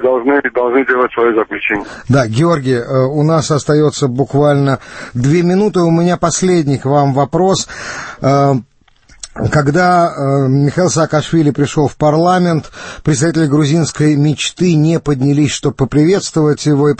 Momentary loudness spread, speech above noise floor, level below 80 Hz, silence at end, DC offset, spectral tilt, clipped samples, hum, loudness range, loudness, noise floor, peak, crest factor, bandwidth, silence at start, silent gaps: 5 LU; 34 dB; -42 dBFS; 0.05 s; under 0.1%; -6 dB/octave; under 0.1%; none; 1 LU; -13 LUFS; -46 dBFS; 0 dBFS; 12 dB; 8.8 kHz; 0 s; none